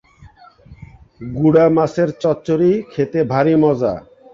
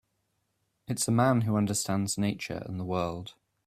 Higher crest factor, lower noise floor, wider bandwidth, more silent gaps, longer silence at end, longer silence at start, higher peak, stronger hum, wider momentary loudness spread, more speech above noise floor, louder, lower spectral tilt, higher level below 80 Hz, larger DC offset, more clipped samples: about the same, 16 dB vs 20 dB; second, -45 dBFS vs -77 dBFS; second, 7.4 kHz vs 16 kHz; neither; about the same, 0.35 s vs 0.35 s; second, 0.25 s vs 0.9 s; first, -2 dBFS vs -10 dBFS; neither; second, 9 LU vs 12 LU; second, 30 dB vs 49 dB; first, -16 LUFS vs -29 LUFS; first, -8.5 dB/octave vs -5 dB/octave; first, -48 dBFS vs -62 dBFS; neither; neither